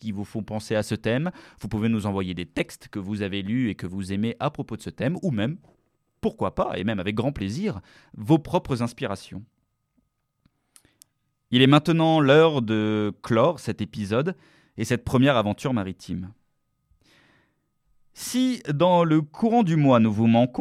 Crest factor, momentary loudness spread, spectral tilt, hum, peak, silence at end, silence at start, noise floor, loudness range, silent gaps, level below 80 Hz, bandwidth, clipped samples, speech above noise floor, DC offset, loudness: 22 dB; 15 LU; -6.5 dB/octave; none; -2 dBFS; 0 s; 0.05 s; -71 dBFS; 8 LU; none; -54 dBFS; 14.5 kHz; under 0.1%; 48 dB; under 0.1%; -24 LUFS